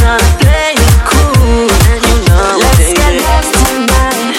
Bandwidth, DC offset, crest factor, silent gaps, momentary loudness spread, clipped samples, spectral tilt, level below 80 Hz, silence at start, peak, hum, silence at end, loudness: 16.5 kHz; under 0.1%; 8 dB; none; 2 LU; 0.4%; -4.5 dB/octave; -10 dBFS; 0 s; 0 dBFS; none; 0 s; -8 LUFS